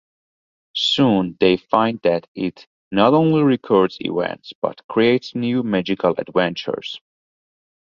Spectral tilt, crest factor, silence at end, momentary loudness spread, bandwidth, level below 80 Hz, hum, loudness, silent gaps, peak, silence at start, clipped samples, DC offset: -6.5 dB/octave; 20 dB; 0.95 s; 11 LU; 7.6 kHz; -58 dBFS; none; -19 LUFS; 2.28-2.35 s, 2.67-2.91 s, 4.55-4.62 s, 4.84-4.89 s; 0 dBFS; 0.75 s; under 0.1%; under 0.1%